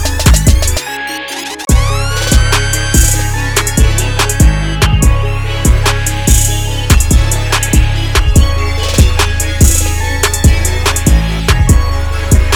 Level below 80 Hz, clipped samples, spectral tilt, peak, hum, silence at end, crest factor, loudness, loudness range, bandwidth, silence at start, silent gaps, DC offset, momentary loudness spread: -12 dBFS; 0.7%; -4 dB/octave; 0 dBFS; none; 0 s; 10 dB; -11 LUFS; 1 LU; over 20 kHz; 0 s; none; under 0.1%; 5 LU